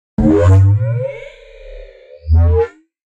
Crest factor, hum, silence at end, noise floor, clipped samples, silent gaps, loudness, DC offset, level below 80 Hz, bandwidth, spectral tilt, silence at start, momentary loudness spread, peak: 12 dB; none; 0.5 s; -36 dBFS; under 0.1%; none; -13 LUFS; under 0.1%; -24 dBFS; 7.6 kHz; -9.5 dB/octave; 0.2 s; 16 LU; -2 dBFS